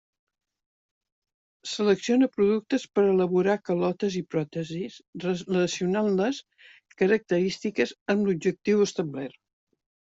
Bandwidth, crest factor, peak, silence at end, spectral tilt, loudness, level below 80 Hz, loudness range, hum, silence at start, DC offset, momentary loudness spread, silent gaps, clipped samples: 8 kHz; 18 dB; -10 dBFS; 0.9 s; -6 dB/octave; -26 LUFS; -68 dBFS; 3 LU; none; 1.65 s; under 0.1%; 11 LU; 5.08-5.13 s, 8.01-8.06 s; under 0.1%